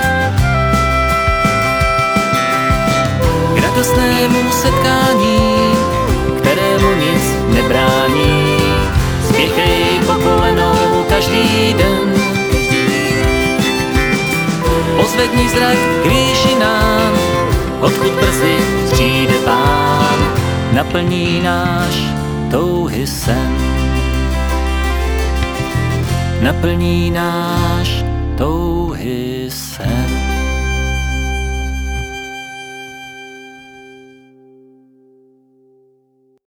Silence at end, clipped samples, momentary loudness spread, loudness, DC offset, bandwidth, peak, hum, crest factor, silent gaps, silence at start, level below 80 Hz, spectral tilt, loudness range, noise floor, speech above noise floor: 2.45 s; under 0.1%; 7 LU; -14 LUFS; under 0.1%; over 20 kHz; 0 dBFS; none; 14 dB; none; 0 s; -24 dBFS; -5 dB/octave; 7 LU; -56 dBFS; 43 dB